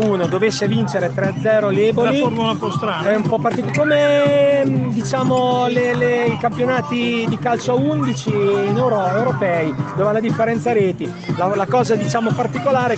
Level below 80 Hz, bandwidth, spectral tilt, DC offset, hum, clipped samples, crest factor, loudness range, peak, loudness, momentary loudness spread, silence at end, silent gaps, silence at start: -54 dBFS; 8.6 kHz; -6.5 dB/octave; under 0.1%; none; under 0.1%; 14 dB; 2 LU; -4 dBFS; -17 LUFS; 5 LU; 0 s; none; 0 s